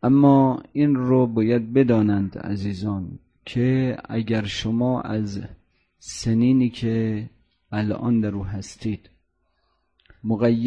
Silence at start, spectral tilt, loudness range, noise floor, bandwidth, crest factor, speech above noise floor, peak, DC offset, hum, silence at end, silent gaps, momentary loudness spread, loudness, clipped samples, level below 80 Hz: 0 s; -7.5 dB/octave; 5 LU; -70 dBFS; 10 kHz; 18 dB; 49 dB; -4 dBFS; under 0.1%; none; 0 s; none; 14 LU; -22 LUFS; under 0.1%; -50 dBFS